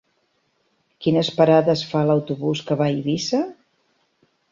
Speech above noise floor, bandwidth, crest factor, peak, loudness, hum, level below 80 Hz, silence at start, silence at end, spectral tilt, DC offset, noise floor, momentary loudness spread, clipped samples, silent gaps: 48 dB; 7.6 kHz; 18 dB; -2 dBFS; -20 LUFS; none; -62 dBFS; 1 s; 1 s; -6.5 dB/octave; under 0.1%; -68 dBFS; 9 LU; under 0.1%; none